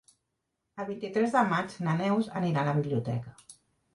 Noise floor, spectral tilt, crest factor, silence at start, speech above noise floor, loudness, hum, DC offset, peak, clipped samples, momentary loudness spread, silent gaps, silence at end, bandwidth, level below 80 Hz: -82 dBFS; -7 dB/octave; 18 dB; 0.75 s; 53 dB; -29 LUFS; none; under 0.1%; -12 dBFS; under 0.1%; 13 LU; none; 0.4 s; 11.5 kHz; -68 dBFS